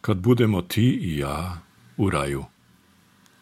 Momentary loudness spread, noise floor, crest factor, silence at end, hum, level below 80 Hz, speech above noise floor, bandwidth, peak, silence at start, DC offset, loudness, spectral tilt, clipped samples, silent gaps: 18 LU; -58 dBFS; 18 dB; 0.95 s; none; -46 dBFS; 36 dB; 15 kHz; -6 dBFS; 0.05 s; under 0.1%; -24 LUFS; -7 dB/octave; under 0.1%; none